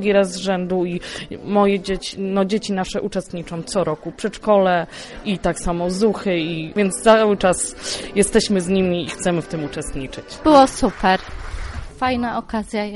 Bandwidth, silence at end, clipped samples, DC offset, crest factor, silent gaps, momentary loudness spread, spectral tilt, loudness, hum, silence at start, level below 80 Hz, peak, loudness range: 11.5 kHz; 0 s; under 0.1%; under 0.1%; 18 dB; none; 15 LU; -4.5 dB/octave; -19 LUFS; none; 0 s; -38 dBFS; -2 dBFS; 4 LU